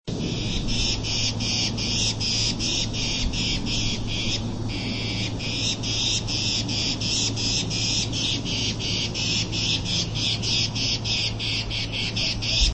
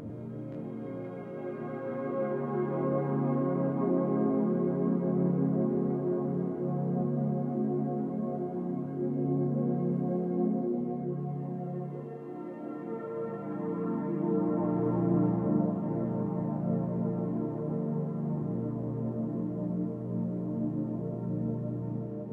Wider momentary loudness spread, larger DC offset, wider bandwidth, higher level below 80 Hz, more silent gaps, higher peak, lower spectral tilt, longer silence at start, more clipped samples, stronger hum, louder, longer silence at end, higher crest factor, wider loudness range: second, 4 LU vs 10 LU; neither; first, 8.8 kHz vs 3.3 kHz; first, -34 dBFS vs -66 dBFS; neither; first, -8 dBFS vs -16 dBFS; second, -3 dB/octave vs -12.5 dB/octave; about the same, 0.05 s vs 0 s; neither; neither; first, -24 LUFS vs -32 LUFS; about the same, 0 s vs 0 s; about the same, 18 dB vs 16 dB; second, 2 LU vs 5 LU